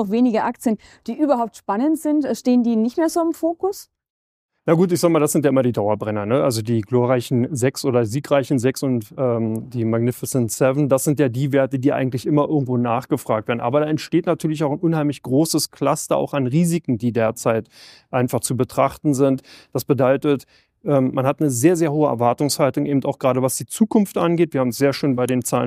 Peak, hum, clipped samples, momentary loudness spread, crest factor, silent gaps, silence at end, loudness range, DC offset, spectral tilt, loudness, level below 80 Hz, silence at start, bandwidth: -2 dBFS; none; under 0.1%; 5 LU; 18 dB; 4.10-4.49 s; 0 s; 2 LU; under 0.1%; -6 dB/octave; -20 LUFS; -60 dBFS; 0 s; 15.5 kHz